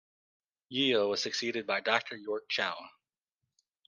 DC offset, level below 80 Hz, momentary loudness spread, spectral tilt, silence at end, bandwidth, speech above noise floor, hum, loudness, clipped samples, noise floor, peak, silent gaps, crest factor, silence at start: under 0.1%; -82 dBFS; 10 LU; -3 dB/octave; 1 s; 10 kHz; 56 dB; none; -31 LUFS; under 0.1%; -88 dBFS; -12 dBFS; none; 24 dB; 0.7 s